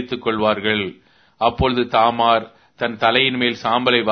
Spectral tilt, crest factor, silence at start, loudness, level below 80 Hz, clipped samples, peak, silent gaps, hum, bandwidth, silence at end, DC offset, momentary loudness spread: -6 dB/octave; 18 dB; 0 s; -18 LUFS; -42 dBFS; under 0.1%; 0 dBFS; none; none; 6.6 kHz; 0 s; under 0.1%; 7 LU